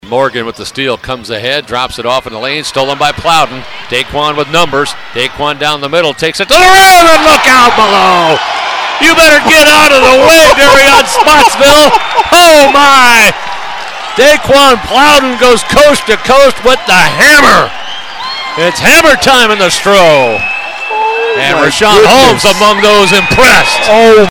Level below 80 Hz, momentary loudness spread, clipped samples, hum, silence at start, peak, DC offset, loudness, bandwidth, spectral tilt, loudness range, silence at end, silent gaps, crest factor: -32 dBFS; 13 LU; 7%; none; 0.05 s; 0 dBFS; under 0.1%; -5 LUFS; over 20 kHz; -2.5 dB/octave; 8 LU; 0 s; none; 6 dB